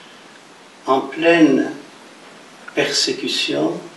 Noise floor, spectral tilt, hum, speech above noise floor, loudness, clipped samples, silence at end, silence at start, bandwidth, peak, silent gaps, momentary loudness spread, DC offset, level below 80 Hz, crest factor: -44 dBFS; -3.5 dB/octave; none; 27 dB; -17 LUFS; under 0.1%; 0 s; 0.85 s; 12 kHz; -2 dBFS; none; 16 LU; under 0.1%; -72 dBFS; 18 dB